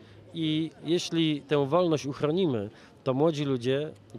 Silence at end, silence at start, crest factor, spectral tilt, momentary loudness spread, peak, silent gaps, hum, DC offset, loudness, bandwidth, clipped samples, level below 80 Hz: 0 s; 0 s; 18 dB; -6 dB/octave; 8 LU; -10 dBFS; none; none; under 0.1%; -28 LUFS; 11.5 kHz; under 0.1%; -68 dBFS